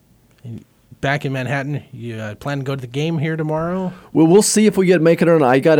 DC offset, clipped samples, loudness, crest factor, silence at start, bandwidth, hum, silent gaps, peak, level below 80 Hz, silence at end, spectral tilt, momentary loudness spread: under 0.1%; under 0.1%; -17 LUFS; 14 dB; 0.45 s; 17.5 kHz; none; none; -2 dBFS; -52 dBFS; 0 s; -5.5 dB/octave; 16 LU